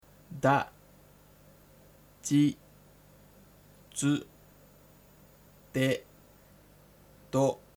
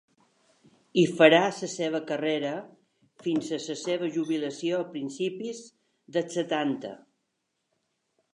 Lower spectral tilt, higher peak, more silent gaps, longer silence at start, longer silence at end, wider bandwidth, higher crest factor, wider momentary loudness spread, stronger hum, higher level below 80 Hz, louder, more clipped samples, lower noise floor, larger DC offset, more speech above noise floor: about the same, -5.5 dB/octave vs -4.5 dB/octave; second, -10 dBFS vs -4 dBFS; neither; second, 0.3 s vs 0.95 s; second, 0.2 s vs 1.4 s; first, over 20 kHz vs 11 kHz; about the same, 24 dB vs 24 dB; about the same, 15 LU vs 16 LU; first, 50 Hz at -60 dBFS vs none; first, -64 dBFS vs -82 dBFS; second, -30 LUFS vs -27 LUFS; neither; second, -58 dBFS vs -79 dBFS; neither; second, 31 dB vs 52 dB